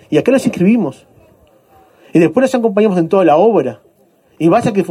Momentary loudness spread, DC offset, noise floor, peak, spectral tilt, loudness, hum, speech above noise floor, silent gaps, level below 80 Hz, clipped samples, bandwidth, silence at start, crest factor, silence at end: 6 LU; under 0.1%; -52 dBFS; 0 dBFS; -7 dB/octave; -13 LUFS; none; 41 dB; none; -56 dBFS; under 0.1%; 14 kHz; 0.1 s; 14 dB; 0 s